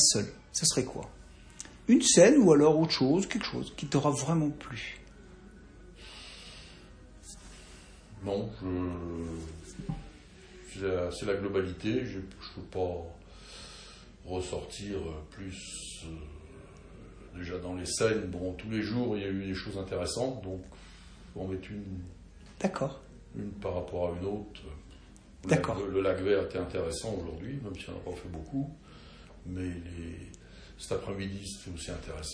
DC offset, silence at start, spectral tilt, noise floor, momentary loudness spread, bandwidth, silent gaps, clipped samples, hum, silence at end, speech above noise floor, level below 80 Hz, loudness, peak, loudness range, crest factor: under 0.1%; 0 s; -4.5 dB/octave; -53 dBFS; 23 LU; 10.5 kHz; none; under 0.1%; none; 0 s; 22 dB; -52 dBFS; -31 LUFS; -8 dBFS; 16 LU; 24 dB